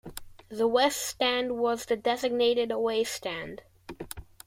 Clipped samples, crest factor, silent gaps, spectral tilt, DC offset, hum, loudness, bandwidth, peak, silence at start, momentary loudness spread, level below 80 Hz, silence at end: under 0.1%; 18 dB; none; -2.5 dB/octave; under 0.1%; none; -28 LUFS; 16.5 kHz; -12 dBFS; 0.05 s; 19 LU; -58 dBFS; 0.25 s